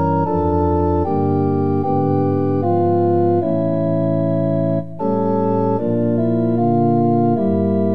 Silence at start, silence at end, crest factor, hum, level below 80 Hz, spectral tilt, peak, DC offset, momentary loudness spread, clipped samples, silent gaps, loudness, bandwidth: 0 s; 0 s; 12 dB; none; -42 dBFS; -12 dB/octave; -4 dBFS; 2%; 3 LU; under 0.1%; none; -17 LUFS; 5 kHz